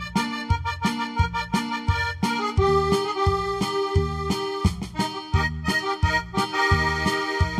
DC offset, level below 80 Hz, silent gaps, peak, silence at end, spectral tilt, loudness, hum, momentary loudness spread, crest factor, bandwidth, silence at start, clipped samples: under 0.1%; -34 dBFS; none; -6 dBFS; 0 s; -5.5 dB/octave; -24 LUFS; none; 5 LU; 16 dB; 14.5 kHz; 0 s; under 0.1%